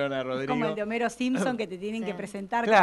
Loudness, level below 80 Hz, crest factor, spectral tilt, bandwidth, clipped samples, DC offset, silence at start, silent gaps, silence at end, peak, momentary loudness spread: -29 LUFS; -66 dBFS; 20 dB; -5 dB/octave; 12 kHz; under 0.1%; under 0.1%; 0 s; none; 0 s; -6 dBFS; 6 LU